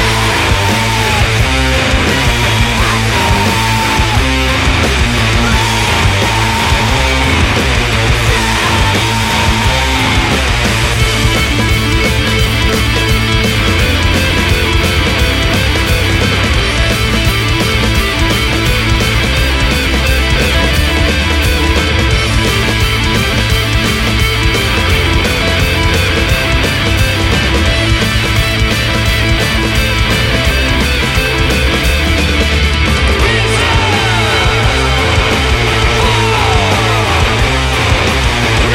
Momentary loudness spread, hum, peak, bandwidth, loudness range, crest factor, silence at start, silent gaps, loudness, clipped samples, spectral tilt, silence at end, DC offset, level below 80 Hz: 1 LU; none; 0 dBFS; 16.5 kHz; 1 LU; 10 dB; 0 s; none; -11 LUFS; under 0.1%; -4 dB/octave; 0 s; under 0.1%; -16 dBFS